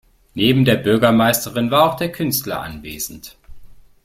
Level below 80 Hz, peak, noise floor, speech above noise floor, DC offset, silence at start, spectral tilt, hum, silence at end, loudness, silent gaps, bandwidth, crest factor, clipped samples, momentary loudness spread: -46 dBFS; -2 dBFS; -38 dBFS; 21 dB; under 0.1%; 0.35 s; -5 dB/octave; none; 0.3 s; -17 LUFS; none; 16.5 kHz; 18 dB; under 0.1%; 14 LU